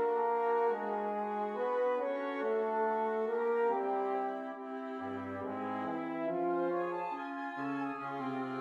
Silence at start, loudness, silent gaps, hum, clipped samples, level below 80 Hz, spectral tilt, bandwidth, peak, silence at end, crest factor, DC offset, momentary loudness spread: 0 s; -35 LUFS; none; none; under 0.1%; -86 dBFS; -7.5 dB/octave; 7 kHz; -22 dBFS; 0 s; 12 dB; under 0.1%; 8 LU